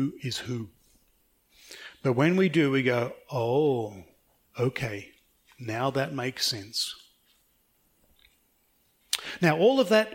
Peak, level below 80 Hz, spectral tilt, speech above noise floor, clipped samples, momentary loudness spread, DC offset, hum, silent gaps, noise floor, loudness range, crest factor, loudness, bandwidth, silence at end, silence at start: -6 dBFS; -66 dBFS; -5 dB/octave; 42 dB; under 0.1%; 19 LU; under 0.1%; none; none; -68 dBFS; 6 LU; 22 dB; -27 LUFS; 16.5 kHz; 0 s; 0 s